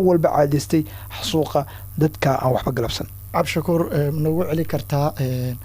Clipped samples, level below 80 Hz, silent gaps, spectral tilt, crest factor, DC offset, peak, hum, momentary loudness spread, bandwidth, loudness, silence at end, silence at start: under 0.1%; -42 dBFS; none; -6.5 dB/octave; 16 dB; under 0.1%; -4 dBFS; none; 7 LU; 16 kHz; -21 LUFS; 0 s; 0 s